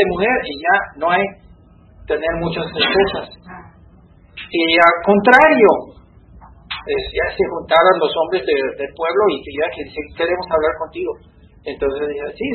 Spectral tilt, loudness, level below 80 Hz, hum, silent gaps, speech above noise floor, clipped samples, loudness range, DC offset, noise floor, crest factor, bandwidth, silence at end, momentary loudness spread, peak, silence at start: -6.5 dB/octave; -16 LUFS; -44 dBFS; none; none; 30 dB; under 0.1%; 7 LU; under 0.1%; -47 dBFS; 18 dB; 7.6 kHz; 0 s; 16 LU; 0 dBFS; 0 s